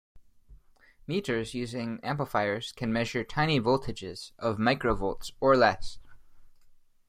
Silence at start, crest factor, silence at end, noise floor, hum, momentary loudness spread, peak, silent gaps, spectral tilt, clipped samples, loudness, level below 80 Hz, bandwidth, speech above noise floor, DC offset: 0.15 s; 22 dB; 0.35 s; -58 dBFS; none; 14 LU; -8 dBFS; none; -5.5 dB/octave; under 0.1%; -29 LUFS; -48 dBFS; 15 kHz; 30 dB; under 0.1%